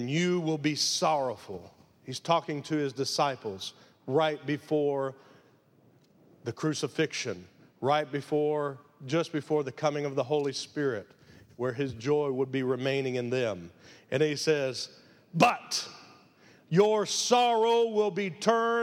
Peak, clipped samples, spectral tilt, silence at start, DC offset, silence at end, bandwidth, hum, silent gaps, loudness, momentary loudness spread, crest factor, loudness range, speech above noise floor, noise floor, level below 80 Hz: -6 dBFS; under 0.1%; -4.5 dB/octave; 0 s; under 0.1%; 0 s; 15.5 kHz; none; none; -29 LUFS; 13 LU; 24 dB; 6 LU; 34 dB; -62 dBFS; -74 dBFS